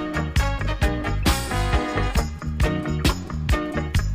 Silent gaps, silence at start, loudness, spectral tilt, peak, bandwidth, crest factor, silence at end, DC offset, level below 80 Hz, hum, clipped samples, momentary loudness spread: none; 0 s; -24 LUFS; -5 dB/octave; -6 dBFS; 16 kHz; 16 dB; 0 s; under 0.1%; -26 dBFS; none; under 0.1%; 3 LU